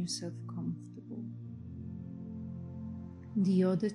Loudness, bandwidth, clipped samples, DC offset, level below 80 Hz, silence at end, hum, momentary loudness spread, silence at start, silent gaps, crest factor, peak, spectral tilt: -37 LUFS; 11 kHz; under 0.1%; under 0.1%; -70 dBFS; 0 s; none; 17 LU; 0 s; none; 16 dB; -18 dBFS; -6.5 dB/octave